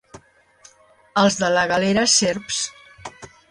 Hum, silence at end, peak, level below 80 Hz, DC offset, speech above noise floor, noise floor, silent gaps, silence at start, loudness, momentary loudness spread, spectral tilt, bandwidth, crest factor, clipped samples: none; 0.25 s; -4 dBFS; -56 dBFS; under 0.1%; 34 dB; -52 dBFS; none; 0.15 s; -19 LUFS; 23 LU; -2.5 dB/octave; 11.5 kHz; 18 dB; under 0.1%